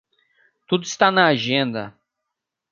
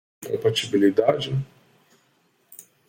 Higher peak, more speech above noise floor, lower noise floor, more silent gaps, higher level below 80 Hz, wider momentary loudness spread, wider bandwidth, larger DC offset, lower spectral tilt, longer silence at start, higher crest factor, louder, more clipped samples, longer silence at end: about the same, -2 dBFS vs -4 dBFS; first, 63 dB vs 43 dB; first, -82 dBFS vs -65 dBFS; neither; second, -66 dBFS vs -60 dBFS; about the same, 14 LU vs 12 LU; second, 7.4 kHz vs 16.5 kHz; neither; second, -4 dB/octave vs -5.5 dB/octave; first, 0.7 s vs 0.2 s; about the same, 20 dB vs 20 dB; first, -19 LUFS vs -22 LUFS; neither; first, 0.8 s vs 0.25 s